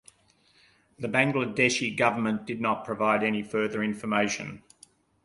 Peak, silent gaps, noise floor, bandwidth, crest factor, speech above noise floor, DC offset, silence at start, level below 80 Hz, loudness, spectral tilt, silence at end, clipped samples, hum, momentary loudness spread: -8 dBFS; none; -64 dBFS; 11.5 kHz; 22 dB; 37 dB; under 0.1%; 1 s; -66 dBFS; -27 LUFS; -4.5 dB/octave; 0.65 s; under 0.1%; none; 7 LU